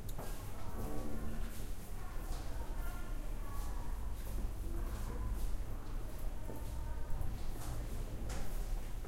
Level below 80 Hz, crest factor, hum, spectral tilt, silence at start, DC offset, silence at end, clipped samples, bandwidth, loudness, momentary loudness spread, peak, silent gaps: -40 dBFS; 14 dB; none; -5.5 dB/octave; 0 s; under 0.1%; 0 s; under 0.1%; 16 kHz; -46 LUFS; 3 LU; -24 dBFS; none